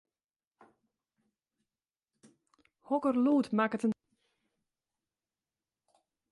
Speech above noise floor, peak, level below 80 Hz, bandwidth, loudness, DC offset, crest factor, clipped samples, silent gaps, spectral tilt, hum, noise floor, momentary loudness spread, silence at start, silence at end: over 61 dB; -16 dBFS; -80 dBFS; 11.5 kHz; -30 LUFS; under 0.1%; 20 dB; under 0.1%; none; -7 dB/octave; none; under -90 dBFS; 7 LU; 2.9 s; 2.4 s